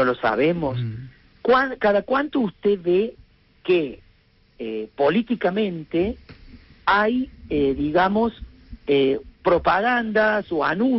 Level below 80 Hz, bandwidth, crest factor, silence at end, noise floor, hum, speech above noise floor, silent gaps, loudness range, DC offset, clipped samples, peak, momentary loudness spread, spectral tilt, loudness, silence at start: -46 dBFS; 6 kHz; 14 dB; 0 s; -57 dBFS; none; 37 dB; none; 4 LU; under 0.1%; under 0.1%; -8 dBFS; 11 LU; -4 dB/octave; -22 LUFS; 0 s